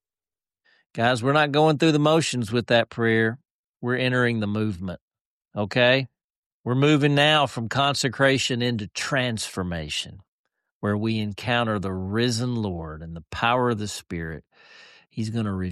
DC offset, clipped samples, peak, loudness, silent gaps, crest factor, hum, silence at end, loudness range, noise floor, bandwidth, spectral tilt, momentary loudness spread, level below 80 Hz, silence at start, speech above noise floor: under 0.1%; under 0.1%; -6 dBFS; -23 LUFS; 3.51-3.74 s, 5.01-5.11 s, 5.20-5.41 s, 6.24-6.64 s, 10.28-10.44 s, 10.71-10.81 s; 18 dB; none; 0 s; 5 LU; under -90 dBFS; 13 kHz; -5 dB/octave; 16 LU; -54 dBFS; 0.95 s; over 67 dB